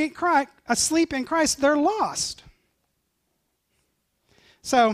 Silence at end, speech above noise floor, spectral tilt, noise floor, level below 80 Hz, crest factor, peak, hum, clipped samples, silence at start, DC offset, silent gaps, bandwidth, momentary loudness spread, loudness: 0 s; 52 dB; -2 dB/octave; -74 dBFS; -56 dBFS; 18 dB; -6 dBFS; none; under 0.1%; 0 s; under 0.1%; none; 15.5 kHz; 8 LU; -23 LUFS